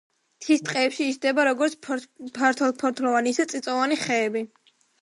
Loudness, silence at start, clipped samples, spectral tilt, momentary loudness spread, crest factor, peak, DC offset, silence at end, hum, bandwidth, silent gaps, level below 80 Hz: -24 LUFS; 0.4 s; under 0.1%; -3 dB/octave; 10 LU; 18 dB; -8 dBFS; under 0.1%; 0.55 s; none; 11.5 kHz; none; -78 dBFS